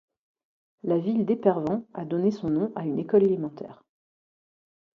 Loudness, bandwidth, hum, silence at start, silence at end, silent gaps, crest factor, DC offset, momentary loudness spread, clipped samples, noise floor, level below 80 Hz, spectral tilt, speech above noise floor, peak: -26 LUFS; 6.6 kHz; none; 0.85 s; 1.2 s; none; 20 dB; under 0.1%; 13 LU; under 0.1%; under -90 dBFS; -66 dBFS; -10 dB/octave; over 65 dB; -8 dBFS